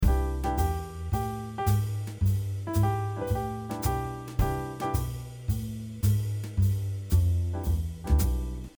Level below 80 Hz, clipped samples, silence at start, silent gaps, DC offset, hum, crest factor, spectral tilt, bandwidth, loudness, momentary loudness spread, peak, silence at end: -32 dBFS; under 0.1%; 0 s; none; under 0.1%; none; 16 dB; -7 dB/octave; over 20 kHz; -30 LUFS; 7 LU; -12 dBFS; 0.1 s